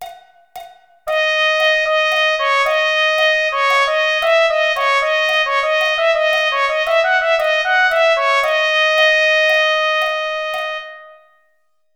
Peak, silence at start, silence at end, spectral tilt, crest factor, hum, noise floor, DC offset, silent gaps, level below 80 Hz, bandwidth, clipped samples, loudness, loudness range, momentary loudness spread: -2 dBFS; 0 s; 0.85 s; 2.5 dB/octave; 14 dB; none; -66 dBFS; under 0.1%; none; -54 dBFS; 19.5 kHz; under 0.1%; -14 LUFS; 2 LU; 7 LU